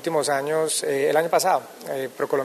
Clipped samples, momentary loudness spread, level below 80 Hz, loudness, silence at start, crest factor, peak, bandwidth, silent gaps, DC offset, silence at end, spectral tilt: under 0.1%; 10 LU; -72 dBFS; -23 LUFS; 0 s; 16 dB; -8 dBFS; 14 kHz; none; under 0.1%; 0 s; -3 dB/octave